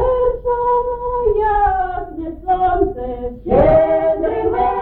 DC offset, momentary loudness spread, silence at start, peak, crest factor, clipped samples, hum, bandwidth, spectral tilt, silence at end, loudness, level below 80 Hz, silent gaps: under 0.1%; 13 LU; 0 s; -2 dBFS; 14 dB; under 0.1%; none; 4.3 kHz; -10.5 dB/octave; 0 s; -17 LUFS; -30 dBFS; none